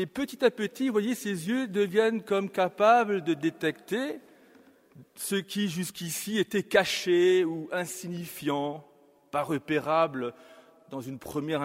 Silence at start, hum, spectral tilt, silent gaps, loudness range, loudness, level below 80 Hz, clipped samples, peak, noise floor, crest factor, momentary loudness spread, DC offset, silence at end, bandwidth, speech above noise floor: 0 s; none; -4.5 dB/octave; none; 5 LU; -28 LUFS; -70 dBFS; under 0.1%; -6 dBFS; -58 dBFS; 22 dB; 12 LU; under 0.1%; 0 s; 16 kHz; 30 dB